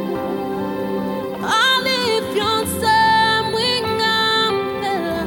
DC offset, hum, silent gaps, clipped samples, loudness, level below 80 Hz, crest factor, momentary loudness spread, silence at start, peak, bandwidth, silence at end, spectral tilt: under 0.1%; none; none; under 0.1%; -18 LUFS; -48 dBFS; 14 dB; 9 LU; 0 s; -4 dBFS; 17 kHz; 0 s; -3.5 dB/octave